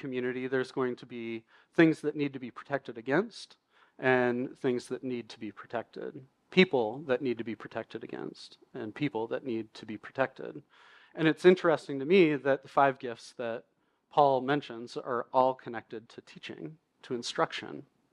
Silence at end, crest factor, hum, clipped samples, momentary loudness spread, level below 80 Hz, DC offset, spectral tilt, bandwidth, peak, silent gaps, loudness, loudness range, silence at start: 0.3 s; 24 dB; none; under 0.1%; 19 LU; -80 dBFS; under 0.1%; -6 dB/octave; 10.5 kHz; -8 dBFS; none; -30 LUFS; 7 LU; 0.05 s